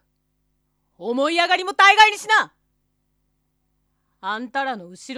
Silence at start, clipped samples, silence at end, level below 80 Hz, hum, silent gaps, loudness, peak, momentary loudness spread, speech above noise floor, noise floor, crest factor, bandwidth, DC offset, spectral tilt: 1 s; under 0.1%; 0 s; -66 dBFS; 50 Hz at -70 dBFS; none; -17 LUFS; 0 dBFS; 20 LU; 52 dB; -70 dBFS; 22 dB; 13.5 kHz; under 0.1%; -1 dB/octave